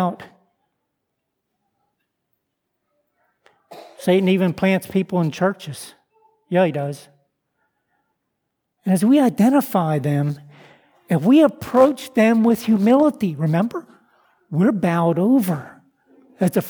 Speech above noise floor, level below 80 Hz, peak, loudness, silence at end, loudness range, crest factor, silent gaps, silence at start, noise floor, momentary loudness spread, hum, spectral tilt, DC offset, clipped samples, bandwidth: 60 dB; -64 dBFS; -2 dBFS; -18 LUFS; 0 s; 8 LU; 18 dB; none; 0 s; -77 dBFS; 14 LU; none; -7 dB/octave; under 0.1%; under 0.1%; over 20 kHz